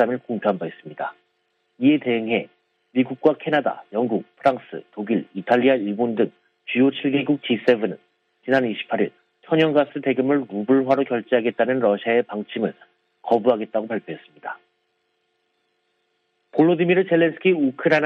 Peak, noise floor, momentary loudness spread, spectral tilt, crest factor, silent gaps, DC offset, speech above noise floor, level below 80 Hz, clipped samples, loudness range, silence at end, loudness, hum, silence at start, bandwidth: -2 dBFS; -71 dBFS; 13 LU; -8 dB/octave; 18 dB; none; under 0.1%; 50 dB; -70 dBFS; under 0.1%; 6 LU; 0 s; -21 LUFS; none; 0 s; 6.4 kHz